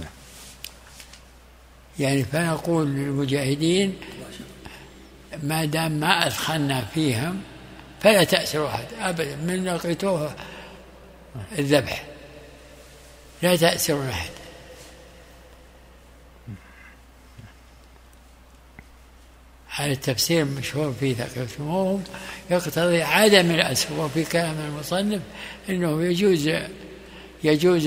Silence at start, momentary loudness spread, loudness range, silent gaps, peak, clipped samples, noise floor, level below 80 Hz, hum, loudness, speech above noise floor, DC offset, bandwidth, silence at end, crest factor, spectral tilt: 0 s; 23 LU; 7 LU; none; 0 dBFS; under 0.1%; -50 dBFS; -50 dBFS; none; -23 LUFS; 27 dB; under 0.1%; 16 kHz; 0 s; 24 dB; -4.5 dB/octave